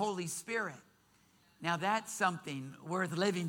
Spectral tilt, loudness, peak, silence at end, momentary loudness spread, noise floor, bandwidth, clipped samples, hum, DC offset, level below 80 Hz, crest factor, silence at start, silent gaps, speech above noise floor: -4 dB/octave; -36 LUFS; -18 dBFS; 0 s; 10 LU; -68 dBFS; 18 kHz; under 0.1%; none; under 0.1%; -80 dBFS; 20 dB; 0 s; none; 33 dB